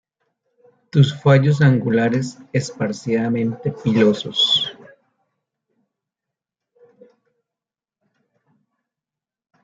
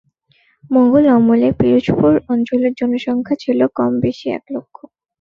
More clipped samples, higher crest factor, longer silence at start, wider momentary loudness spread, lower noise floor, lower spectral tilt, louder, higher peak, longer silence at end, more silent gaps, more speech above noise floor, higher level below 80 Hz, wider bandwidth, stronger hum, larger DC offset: neither; about the same, 18 dB vs 14 dB; first, 0.95 s vs 0.7 s; about the same, 10 LU vs 12 LU; first, -89 dBFS vs -58 dBFS; second, -6 dB/octave vs -8.5 dB/octave; second, -18 LUFS vs -15 LUFS; about the same, -2 dBFS vs -2 dBFS; first, 4.9 s vs 0.6 s; neither; first, 71 dB vs 44 dB; second, -60 dBFS vs -46 dBFS; first, 7.8 kHz vs 6.6 kHz; neither; neither